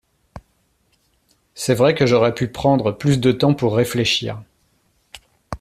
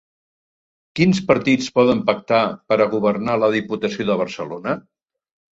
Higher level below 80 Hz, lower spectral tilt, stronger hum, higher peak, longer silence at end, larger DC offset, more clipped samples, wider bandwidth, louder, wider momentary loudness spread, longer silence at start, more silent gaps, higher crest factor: first, -48 dBFS vs -56 dBFS; about the same, -5.5 dB/octave vs -6 dB/octave; neither; about the same, -2 dBFS vs -2 dBFS; second, 0.05 s vs 0.8 s; neither; neither; first, 14.5 kHz vs 8 kHz; about the same, -18 LUFS vs -19 LUFS; about the same, 11 LU vs 10 LU; second, 0.35 s vs 0.95 s; neither; about the same, 18 dB vs 18 dB